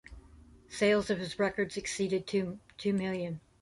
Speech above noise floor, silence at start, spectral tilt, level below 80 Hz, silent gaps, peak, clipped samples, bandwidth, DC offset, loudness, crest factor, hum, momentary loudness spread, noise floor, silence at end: 25 dB; 0.1 s; -5 dB/octave; -60 dBFS; none; -14 dBFS; under 0.1%; 11.5 kHz; under 0.1%; -32 LUFS; 18 dB; none; 10 LU; -56 dBFS; 0.25 s